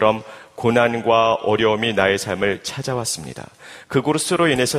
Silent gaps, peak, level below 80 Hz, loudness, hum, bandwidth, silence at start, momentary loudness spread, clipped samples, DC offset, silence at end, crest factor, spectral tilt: none; 0 dBFS; -54 dBFS; -19 LUFS; none; 15.5 kHz; 0 s; 11 LU; under 0.1%; under 0.1%; 0 s; 20 dB; -4 dB/octave